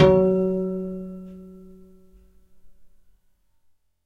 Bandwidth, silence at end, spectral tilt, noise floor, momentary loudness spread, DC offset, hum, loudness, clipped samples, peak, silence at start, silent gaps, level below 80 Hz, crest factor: 6.6 kHz; 1.2 s; -9 dB/octave; -63 dBFS; 26 LU; under 0.1%; none; -23 LUFS; under 0.1%; -2 dBFS; 0 s; none; -48 dBFS; 22 dB